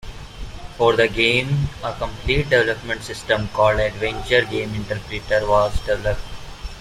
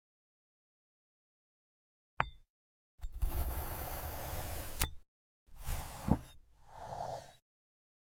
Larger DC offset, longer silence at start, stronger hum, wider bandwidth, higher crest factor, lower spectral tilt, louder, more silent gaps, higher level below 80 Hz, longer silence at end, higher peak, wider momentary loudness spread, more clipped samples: neither; second, 0.05 s vs 2.2 s; neither; second, 14.5 kHz vs 17 kHz; second, 18 dB vs 32 dB; about the same, -5 dB/octave vs -4.5 dB/octave; first, -20 LUFS vs -40 LUFS; second, none vs 2.50-2.98 s, 5.08-5.46 s; first, -34 dBFS vs -46 dBFS; second, 0 s vs 0.7 s; first, -2 dBFS vs -8 dBFS; first, 19 LU vs 16 LU; neither